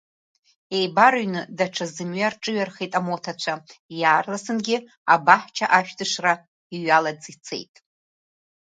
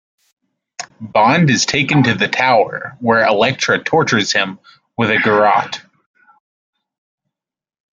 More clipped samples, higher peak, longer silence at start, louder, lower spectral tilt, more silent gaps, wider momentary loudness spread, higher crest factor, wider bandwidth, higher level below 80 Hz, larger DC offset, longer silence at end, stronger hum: neither; about the same, 0 dBFS vs 0 dBFS; about the same, 0.7 s vs 0.8 s; second, -22 LUFS vs -14 LUFS; about the same, -3.5 dB/octave vs -4.5 dB/octave; first, 3.79-3.89 s, 4.97-5.05 s, 6.48-6.70 s vs none; about the same, 16 LU vs 17 LU; first, 24 dB vs 16 dB; about the same, 9.4 kHz vs 9.2 kHz; second, -74 dBFS vs -56 dBFS; neither; second, 1.1 s vs 2.15 s; neither